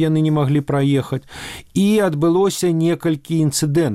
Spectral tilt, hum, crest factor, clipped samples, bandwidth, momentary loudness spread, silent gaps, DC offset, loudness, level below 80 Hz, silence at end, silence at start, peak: -6 dB/octave; none; 10 dB; under 0.1%; 16 kHz; 9 LU; none; under 0.1%; -18 LUFS; -50 dBFS; 0 s; 0 s; -6 dBFS